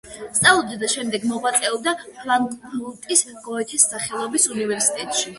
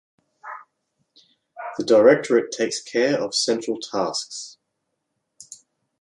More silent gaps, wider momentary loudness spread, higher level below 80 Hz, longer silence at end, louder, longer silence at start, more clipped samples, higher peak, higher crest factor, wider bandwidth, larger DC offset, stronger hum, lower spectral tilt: neither; second, 12 LU vs 24 LU; first, -58 dBFS vs -72 dBFS; second, 0 s vs 0.45 s; about the same, -20 LUFS vs -20 LUFS; second, 0.05 s vs 0.45 s; neither; about the same, 0 dBFS vs -2 dBFS; about the same, 22 dB vs 22 dB; about the same, 12 kHz vs 11.5 kHz; neither; neither; second, -1 dB/octave vs -3 dB/octave